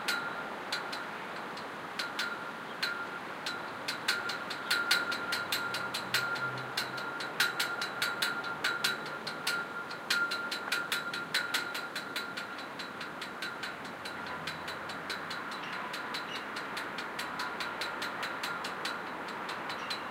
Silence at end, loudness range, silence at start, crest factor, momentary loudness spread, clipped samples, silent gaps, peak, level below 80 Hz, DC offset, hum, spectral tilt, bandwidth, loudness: 0 s; 6 LU; 0 s; 24 dB; 9 LU; under 0.1%; none; -12 dBFS; -76 dBFS; under 0.1%; none; -1.5 dB/octave; 16.5 kHz; -35 LUFS